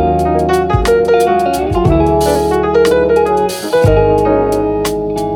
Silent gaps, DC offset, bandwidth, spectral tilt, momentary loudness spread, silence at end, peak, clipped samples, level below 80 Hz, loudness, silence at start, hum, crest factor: none; under 0.1%; 19.5 kHz; -6.5 dB/octave; 4 LU; 0 s; 0 dBFS; under 0.1%; -24 dBFS; -12 LUFS; 0 s; none; 12 dB